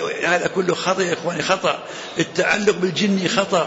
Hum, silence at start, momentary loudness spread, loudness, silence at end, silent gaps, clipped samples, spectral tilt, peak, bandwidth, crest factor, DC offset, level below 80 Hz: none; 0 s; 5 LU; -20 LUFS; 0 s; none; under 0.1%; -4 dB/octave; -4 dBFS; 8 kHz; 16 dB; under 0.1%; -58 dBFS